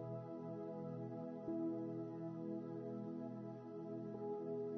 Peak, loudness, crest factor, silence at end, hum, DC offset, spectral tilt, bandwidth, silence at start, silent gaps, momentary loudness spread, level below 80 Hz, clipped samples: -34 dBFS; -47 LUFS; 12 dB; 0 s; none; under 0.1%; -10.5 dB/octave; 6.2 kHz; 0 s; none; 5 LU; -86 dBFS; under 0.1%